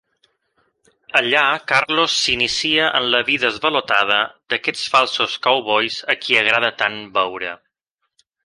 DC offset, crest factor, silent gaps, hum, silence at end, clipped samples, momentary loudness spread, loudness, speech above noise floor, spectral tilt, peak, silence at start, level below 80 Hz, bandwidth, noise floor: under 0.1%; 20 dB; none; none; 0.9 s; under 0.1%; 6 LU; -17 LUFS; 57 dB; -2 dB/octave; 0 dBFS; 1.15 s; -58 dBFS; 11.5 kHz; -76 dBFS